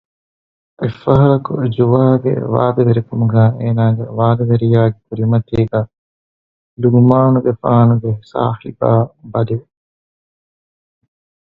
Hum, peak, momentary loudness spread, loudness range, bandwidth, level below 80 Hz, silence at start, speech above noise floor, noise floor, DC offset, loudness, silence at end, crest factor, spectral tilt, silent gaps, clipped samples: none; 0 dBFS; 9 LU; 4 LU; 4.3 kHz; -44 dBFS; 0.8 s; over 77 dB; under -90 dBFS; under 0.1%; -14 LUFS; 1.9 s; 14 dB; -11.5 dB/octave; 5.98-6.77 s; under 0.1%